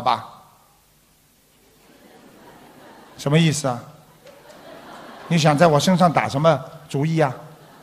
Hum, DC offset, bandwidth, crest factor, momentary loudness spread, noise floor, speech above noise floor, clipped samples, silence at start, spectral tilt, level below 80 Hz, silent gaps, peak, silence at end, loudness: none; under 0.1%; 15.5 kHz; 20 dB; 24 LU; -57 dBFS; 40 dB; under 0.1%; 0 s; -5.5 dB/octave; -60 dBFS; none; -2 dBFS; 0.35 s; -19 LUFS